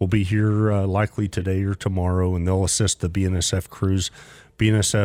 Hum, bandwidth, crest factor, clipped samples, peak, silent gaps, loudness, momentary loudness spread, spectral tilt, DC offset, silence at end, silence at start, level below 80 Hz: none; 15.5 kHz; 14 dB; under 0.1%; -6 dBFS; none; -22 LUFS; 5 LU; -5 dB/octave; under 0.1%; 0 s; 0 s; -40 dBFS